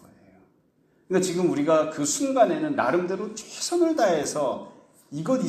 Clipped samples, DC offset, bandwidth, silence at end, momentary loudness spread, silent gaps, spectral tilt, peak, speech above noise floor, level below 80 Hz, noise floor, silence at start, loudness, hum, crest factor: under 0.1%; under 0.1%; 14.5 kHz; 0 s; 10 LU; none; -4.5 dB/octave; -6 dBFS; 40 dB; -70 dBFS; -64 dBFS; 1.1 s; -24 LUFS; none; 18 dB